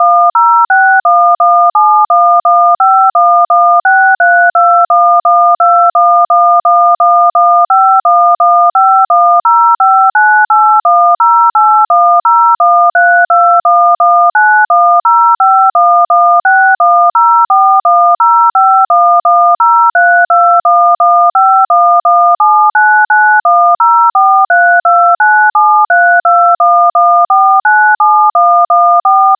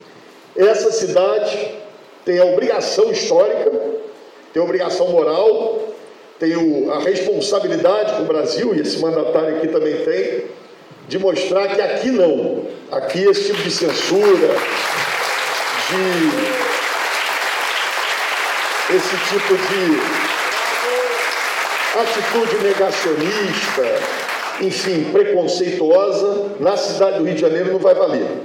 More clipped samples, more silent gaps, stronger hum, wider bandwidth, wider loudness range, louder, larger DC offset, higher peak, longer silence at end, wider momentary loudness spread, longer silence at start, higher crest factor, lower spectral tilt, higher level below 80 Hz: neither; neither; neither; second, 1.9 kHz vs 17 kHz; about the same, 0 LU vs 2 LU; first, -7 LUFS vs -17 LUFS; neither; first, 0 dBFS vs -4 dBFS; about the same, 0.05 s vs 0 s; second, 1 LU vs 7 LU; about the same, 0 s vs 0.1 s; second, 6 dB vs 14 dB; about the same, -4 dB/octave vs -3.5 dB/octave; second, -74 dBFS vs -68 dBFS